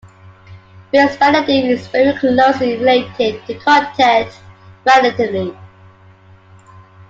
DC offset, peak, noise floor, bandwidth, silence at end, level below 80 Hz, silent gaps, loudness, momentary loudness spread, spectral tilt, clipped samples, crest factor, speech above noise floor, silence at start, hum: under 0.1%; 0 dBFS; -44 dBFS; 7.8 kHz; 1.45 s; -54 dBFS; none; -14 LUFS; 8 LU; -5 dB/octave; under 0.1%; 14 dB; 31 dB; 0.5 s; none